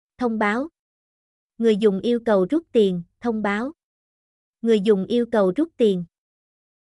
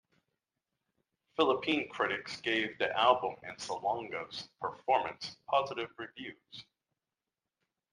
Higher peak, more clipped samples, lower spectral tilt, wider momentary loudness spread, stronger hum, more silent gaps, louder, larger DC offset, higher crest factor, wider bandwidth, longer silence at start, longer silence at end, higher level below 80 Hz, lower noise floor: about the same, -8 dBFS vs -10 dBFS; neither; first, -7 dB/octave vs -3.5 dB/octave; second, 9 LU vs 15 LU; neither; first, 0.79-1.50 s, 3.84-4.54 s vs none; first, -21 LUFS vs -33 LUFS; neither; second, 16 dB vs 24 dB; about the same, 11.5 kHz vs 11 kHz; second, 0.2 s vs 1.4 s; second, 0.85 s vs 1.3 s; first, -62 dBFS vs -76 dBFS; about the same, under -90 dBFS vs under -90 dBFS